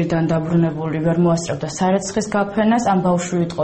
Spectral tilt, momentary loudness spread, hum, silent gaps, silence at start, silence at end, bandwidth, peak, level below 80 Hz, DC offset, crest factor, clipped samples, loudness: -6.5 dB/octave; 5 LU; none; none; 0 s; 0 s; 8.8 kHz; -6 dBFS; -48 dBFS; under 0.1%; 12 dB; under 0.1%; -19 LUFS